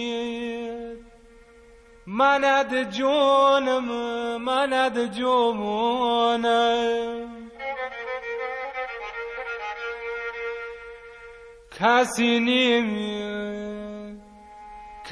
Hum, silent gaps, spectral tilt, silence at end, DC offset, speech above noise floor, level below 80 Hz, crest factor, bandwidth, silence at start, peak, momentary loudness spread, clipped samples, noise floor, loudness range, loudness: none; none; -3.5 dB/octave; 0 s; under 0.1%; 29 dB; -58 dBFS; 20 dB; 11 kHz; 0 s; -6 dBFS; 20 LU; under 0.1%; -51 dBFS; 10 LU; -24 LUFS